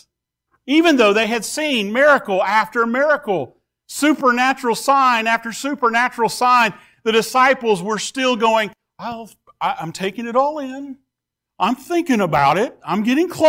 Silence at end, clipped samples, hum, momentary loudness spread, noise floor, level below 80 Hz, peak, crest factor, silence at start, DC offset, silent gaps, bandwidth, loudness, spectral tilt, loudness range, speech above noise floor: 0 s; under 0.1%; none; 11 LU; -82 dBFS; -60 dBFS; -4 dBFS; 14 dB; 0.65 s; under 0.1%; none; 16 kHz; -17 LUFS; -4 dB/octave; 6 LU; 65 dB